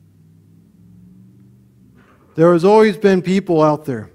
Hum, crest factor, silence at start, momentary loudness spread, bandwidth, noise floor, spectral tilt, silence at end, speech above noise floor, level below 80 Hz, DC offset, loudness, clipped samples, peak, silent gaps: none; 16 dB; 2.35 s; 8 LU; 12.5 kHz; -49 dBFS; -7.5 dB/octave; 0.1 s; 36 dB; -58 dBFS; under 0.1%; -14 LUFS; under 0.1%; 0 dBFS; none